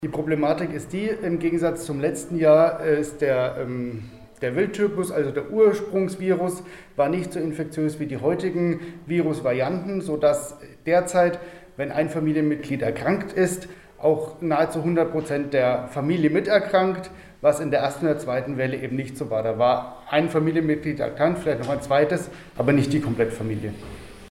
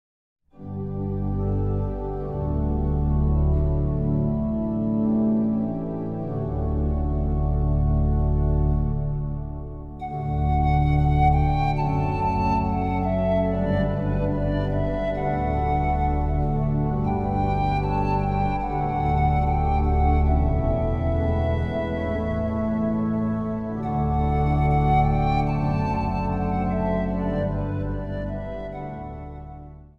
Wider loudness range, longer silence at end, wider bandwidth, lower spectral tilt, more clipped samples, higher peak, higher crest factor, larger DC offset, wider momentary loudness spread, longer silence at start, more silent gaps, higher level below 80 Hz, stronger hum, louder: about the same, 2 LU vs 2 LU; about the same, 0.05 s vs 0.1 s; first, 16 kHz vs 5.4 kHz; second, -6.5 dB/octave vs -10 dB/octave; neither; about the same, -6 dBFS vs -8 dBFS; about the same, 18 dB vs 14 dB; neither; about the same, 9 LU vs 9 LU; second, 0 s vs 0.55 s; neither; second, -52 dBFS vs -28 dBFS; neither; about the same, -23 LUFS vs -24 LUFS